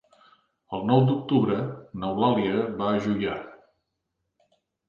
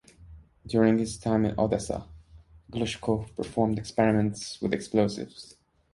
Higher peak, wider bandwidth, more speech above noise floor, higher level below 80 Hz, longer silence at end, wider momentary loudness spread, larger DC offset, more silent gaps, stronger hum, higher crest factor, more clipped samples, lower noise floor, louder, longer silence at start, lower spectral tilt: about the same, -8 dBFS vs -8 dBFS; second, 7 kHz vs 11.5 kHz; first, 56 dB vs 27 dB; second, -60 dBFS vs -50 dBFS; first, 1.35 s vs 0.5 s; about the same, 13 LU vs 12 LU; neither; neither; neither; about the same, 20 dB vs 20 dB; neither; first, -80 dBFS vs -53 dBFS; about the same, -25 LUFS vs -27 LUFS; first, 0.7 s vs 0.2 s; first, -8.5 dB/octave vs -6 dB/octave